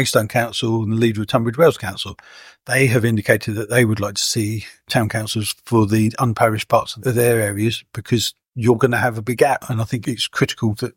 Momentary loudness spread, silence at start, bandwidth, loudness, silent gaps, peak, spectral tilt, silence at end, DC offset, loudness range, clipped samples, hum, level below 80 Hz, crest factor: 7 LU; 0 s; 17 kHz; -19 LUFS; none; 0 dBFS; -5 dB/octave; 0.05 s; under 0.1%; 1 LU; under 0.1%; none; -52 dBFS; 18 dB